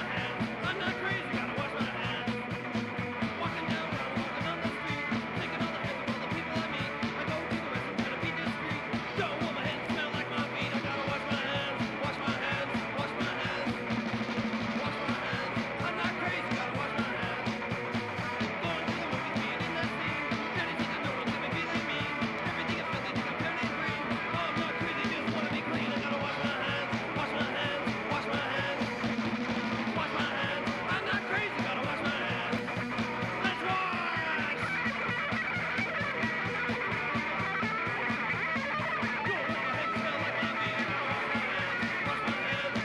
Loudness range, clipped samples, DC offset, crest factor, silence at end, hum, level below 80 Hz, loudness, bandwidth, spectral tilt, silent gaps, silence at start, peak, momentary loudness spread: 2 LU; under 0.1%; under 0.1%; 16 dB; 0 s; none; -60 dBFS; -32 LUFS; 12.5 kHz; -5.5 dB/octave; none; 0 s; -18 dBFS; 3 LU